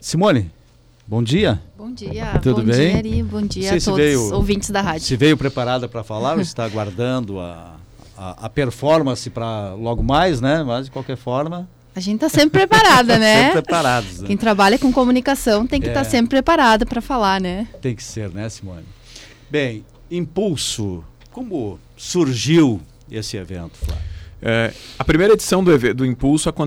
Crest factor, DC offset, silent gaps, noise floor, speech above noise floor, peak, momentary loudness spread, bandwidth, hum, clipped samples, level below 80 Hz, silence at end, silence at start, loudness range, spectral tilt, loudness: 12 dB; under 0.1%; none; -50 dBFS; 33 dB; -6 dBFS; 16 LU; 16.5 kHz; none; under 0.1%; -34 dBFS; 0 s; 0 s; 10 LU; -5 dB/octave; -17 LUFS